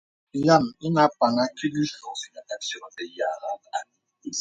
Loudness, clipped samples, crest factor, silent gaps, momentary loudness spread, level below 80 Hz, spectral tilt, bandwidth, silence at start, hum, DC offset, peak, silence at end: -25 LUFS; under 0.1%; 20 dB; none; 15 LU; -64 dBFS; -5 dB/octave; 9.2 kHz; 0.35 s; none; under 0.1%; -4 dBFS; 0 s